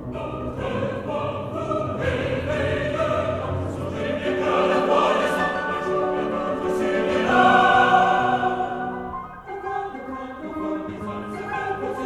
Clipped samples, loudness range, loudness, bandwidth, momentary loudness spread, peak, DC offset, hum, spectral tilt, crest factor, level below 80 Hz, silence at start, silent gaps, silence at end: under 0.1%; 7 LU; -23 LUFS; 13.5 kHz; 15 LU; -4 dBFS; under 0.1%; none; -6 dB/octave; 20 dB; -46 dBFS; 0 s; none; 0 s